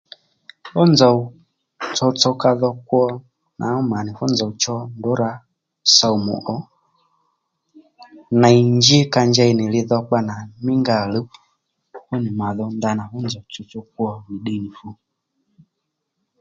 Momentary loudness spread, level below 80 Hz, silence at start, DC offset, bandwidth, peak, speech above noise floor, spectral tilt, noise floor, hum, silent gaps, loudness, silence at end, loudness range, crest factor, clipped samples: 17 LU; -56 dBFS; 0.65 s; under 0.1%; 7.8 kHz; 0 dBFS; 59 dB; -5 dB/octave; -77 dBFS; none; none; -18 LUFS; 1.5 s; 10 LU; 20 dB; under 0.1%